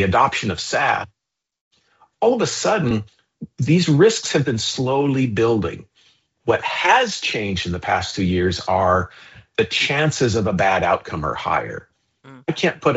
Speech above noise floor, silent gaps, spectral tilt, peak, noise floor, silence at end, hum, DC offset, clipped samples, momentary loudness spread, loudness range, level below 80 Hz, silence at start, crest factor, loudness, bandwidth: 40 dB; 1.61-1.71 s; -4 dB/octave; -2 dBFS; -59 dBFS; 0 s; none; under 0.1%; under 0.1%; 11 LU; 2 LU; -52 dBFS; 0 s; 18 dB; -19 LUFS; 8 kHz